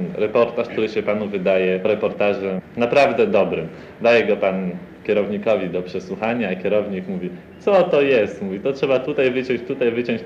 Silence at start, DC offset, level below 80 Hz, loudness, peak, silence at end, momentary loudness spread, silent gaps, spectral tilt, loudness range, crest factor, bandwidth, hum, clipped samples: 0 s; under 0.1%; -58 dBFS; -20 LUFS; -2 dBFS; 0 s; 10 LU; none; -7 dB/octave; 3 LU; 16 dB; 8.2 kHz; none; under 0.1%